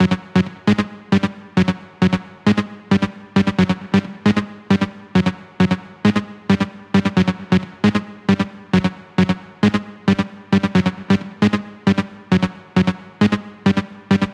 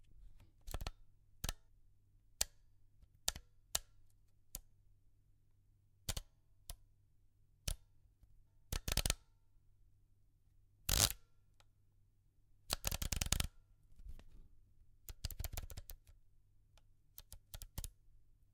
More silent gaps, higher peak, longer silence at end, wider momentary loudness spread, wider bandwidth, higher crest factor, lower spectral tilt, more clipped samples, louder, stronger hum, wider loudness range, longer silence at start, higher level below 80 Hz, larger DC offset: neither; first, -4 dBFS vs -12 dBFS; second, 0 s vs 0.3 s; second, 3 LU vs 21 LU; second, 9 kHz vs 18 kHz; second, 16 dB vs 36 dB; first, -7 dB/octave vs -2 dB/octave; neither; first, -19 LUFS vs -42 LUFS; neither; second, 1 LU vs 13 LU; about the same, 0 s vs 0.05 s; about the same, -50 dBFS vs -52 dBFS; neither